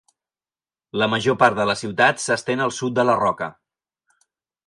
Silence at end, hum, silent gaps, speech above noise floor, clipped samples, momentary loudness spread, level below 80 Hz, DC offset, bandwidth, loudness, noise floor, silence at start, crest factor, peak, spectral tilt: 1.15 s; none; none; over 70 dB; under 0.1%; 7 LU; -60 dBFS; under 0.1%; 11.5 kHz; -20 LUFS; under -90 dBFS; 0.95 s; 20 dB; -2 dBFS; -4 dB/octave